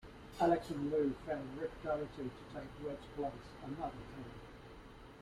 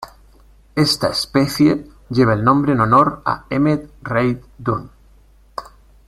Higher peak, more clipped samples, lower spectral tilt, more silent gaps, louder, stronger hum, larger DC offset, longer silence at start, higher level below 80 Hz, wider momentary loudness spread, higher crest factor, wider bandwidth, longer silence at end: second, -20 dBFS vs -2 dBFS; neither; about the same, -7 dB/octave vs -6 dB/octave; neither; second, -40 LUFS vs -17 LUFS; neither; neither; about the same, 0 s vs 0 s; second, -60 dBFS vs -44 dBFS; first, 19 LU vs 14 LU; about the same, 22 dB vs 18 dB; about the same, 14.5 kHz vs 14.5 kHz; second, 0 s vs 0.45 s